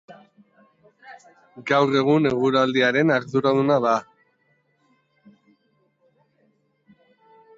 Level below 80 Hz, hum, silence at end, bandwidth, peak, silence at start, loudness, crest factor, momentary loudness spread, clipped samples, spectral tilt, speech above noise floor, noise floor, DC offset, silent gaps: -64 dBFS; none; 3.55 s; 7.6 kHz; -6 dBFS; 0.1 s; -20 LUFS; 18 dB; 4 LU; under 0.1%; -6.5 dB/octave; 47 dB; -66 dBFS; under 0.1%; none